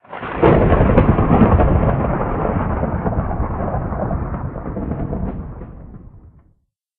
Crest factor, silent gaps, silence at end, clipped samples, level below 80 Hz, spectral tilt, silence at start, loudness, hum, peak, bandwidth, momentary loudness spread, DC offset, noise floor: 18 dB; none; 0.8 s; under 0.1%; -24 dBFS; -8.5 dB/octave; 0.1 s; -18 LUFS; none; 0 dBFS; 4 kHz; 14 LU; under 0.1%; -61 dBFS